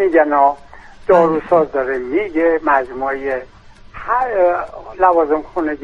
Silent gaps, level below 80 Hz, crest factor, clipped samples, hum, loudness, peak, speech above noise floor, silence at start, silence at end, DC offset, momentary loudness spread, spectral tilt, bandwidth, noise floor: none; -44 dBFS; 16 dB; under 0.1%; none; -16 LUFS; 0 dBFS; 21 dB; 0 s; 0 s; under 0.1%; 10 LU; -7.5 dB/octave; 7 kHz; -36 dBFS